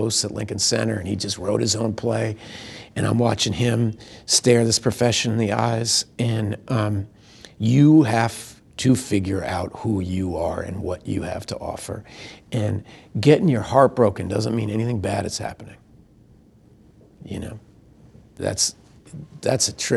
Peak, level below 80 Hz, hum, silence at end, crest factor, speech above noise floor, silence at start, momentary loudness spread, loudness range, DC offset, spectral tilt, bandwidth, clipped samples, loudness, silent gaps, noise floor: -2 dBFS; -50 dBFS; none; 0 s; 22 dB; 31 dB; 0 s; 17 LU; 10 LU; under 0.1%; -4.5 dB/octave; 13 kHz; under 0.1%; -21 LUFS; none; -52 dBFS